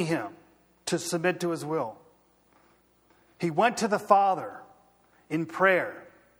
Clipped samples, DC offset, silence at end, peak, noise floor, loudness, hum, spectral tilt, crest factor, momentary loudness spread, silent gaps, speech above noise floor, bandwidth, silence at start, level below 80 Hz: under 0.1%; under 0.1%; 0.35 s; -6 dBFS; -64 dBFS; -27 LUFS; 60 Hz at -60 dBFS; -4.5 dB/octave; 24 dB; 16 LU; none; 37 dB; over 20 kHz; 0 s; -74 dBFS